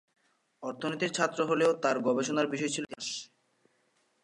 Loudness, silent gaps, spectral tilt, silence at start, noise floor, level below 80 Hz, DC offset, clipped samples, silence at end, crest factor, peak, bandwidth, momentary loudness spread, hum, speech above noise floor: -30 LUFS; none; -4 dB/octave; 0.6 s; -72 dBFS; -82 dBFS; under 0.1%; under 0.1%; 1 s; 20 dB; -12 dBFS; 11.5 kHz; 11 LU; none; 42 dB